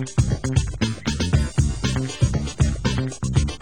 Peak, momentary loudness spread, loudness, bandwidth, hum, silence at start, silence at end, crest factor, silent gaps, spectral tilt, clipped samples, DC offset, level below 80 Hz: -6 dBFS; 3 LU; -23 LUFS; 16 kHz; none; 0 s; 0.05 s; 16 dB; none; -5.5 dB/octave; under 0.1%; 0.7%; -28 dBFS